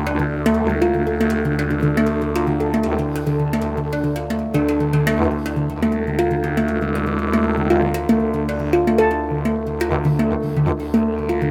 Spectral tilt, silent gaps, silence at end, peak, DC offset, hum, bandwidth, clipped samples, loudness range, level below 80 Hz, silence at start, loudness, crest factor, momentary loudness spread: -8 dB/octave; none; 0 s; -4 dBFS; under 0.1%; none; 17 kHz; under 0.1%; 2 LU; -30 dBFS; 0 s; -20 LUFS; 14 dB; 5 LU